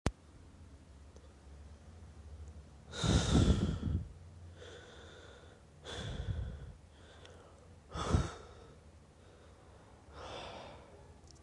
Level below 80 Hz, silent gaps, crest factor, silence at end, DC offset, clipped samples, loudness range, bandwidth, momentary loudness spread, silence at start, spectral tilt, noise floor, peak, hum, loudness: -46 dBFS; none; 28 dB; 0.05 s; under 0.1%; under 0.1%; 11 LU; 11.5 kHz; 26 LU; 0.05 s; -5.5 dB/octave; -59 dBFS; -12 dBFS; none; -36 LUFS